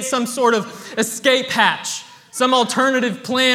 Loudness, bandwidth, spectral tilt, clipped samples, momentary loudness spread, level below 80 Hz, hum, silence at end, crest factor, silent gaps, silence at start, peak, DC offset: -18 LUFS; 16.5 kHz; -2.5 dB/octave; under 0.1%; 11 LU; -68 dBFS; none; 0 s; 18 dB; none; 0 s; 0 dBFS; under 0.1%